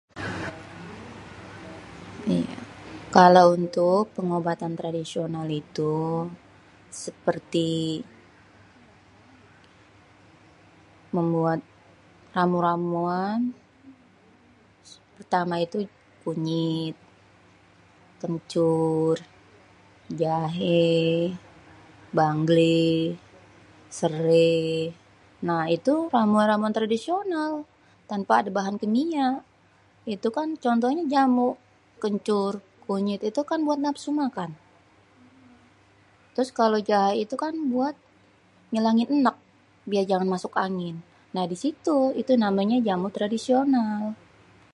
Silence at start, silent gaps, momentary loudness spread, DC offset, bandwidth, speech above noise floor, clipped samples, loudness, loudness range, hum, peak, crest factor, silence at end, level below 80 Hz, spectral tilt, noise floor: 0.15 s; none; 16 LU; under 0.1%; 11.5 kHz; 36 dB; under 0.1%; -25 LUFS; 9 LU; none; 0 dBFS; 24 dB; 0.6 s; -64 dBFS; -6.5 dB/octave; -59 dBFS